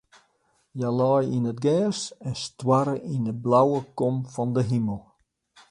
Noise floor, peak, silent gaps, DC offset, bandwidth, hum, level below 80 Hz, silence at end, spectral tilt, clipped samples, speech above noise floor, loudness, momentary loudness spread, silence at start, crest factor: -68 dBFS; -8 dBFS; none; under 0.1%; 10.5 kHz; none; -60 dBFS; 0.7 s; -7 dB/octave; under 0.1%; 44 dB; -25 LUFS; 11 LU; 0.75 s; 18 dB